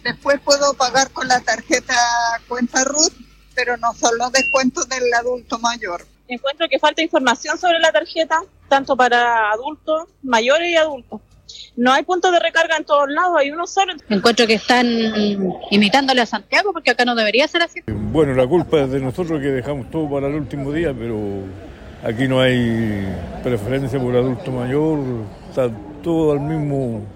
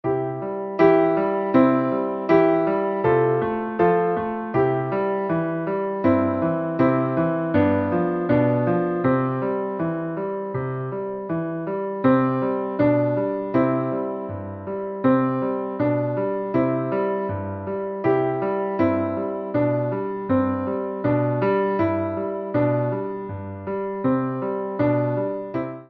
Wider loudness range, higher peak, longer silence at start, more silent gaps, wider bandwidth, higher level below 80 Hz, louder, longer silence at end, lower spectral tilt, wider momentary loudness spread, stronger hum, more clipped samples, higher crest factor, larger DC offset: about the same, 5 LU vs 4 LU; about the same, -2 dBFS vs -4 dBFS; about the same, 0.05 s vs 0.05 s; neither; first, 16 kHz vs 5.6 kHz; first, -44 dBFS vs -56 dBFS; first, -18 LUFS vs -22 LUFS; about the same, 0 s vs 0.05 s; second, -3.5 dB/octave vs -8 dB/octave; about the same, 10 LU vs 9 LU; neither; neither; about the same, 18 dB vs 18 dB; neither